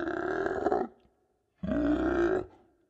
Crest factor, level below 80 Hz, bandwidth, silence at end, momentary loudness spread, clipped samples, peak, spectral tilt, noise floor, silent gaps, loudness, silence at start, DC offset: 20 dB; -50 dBFS; 8 kHz; 0.45 s; 12 LU; under 0.1%; -12 dBFS; -7.5 dB/octave; -73 dBFS; none; -31 LUFS; 0 s; under 0.1%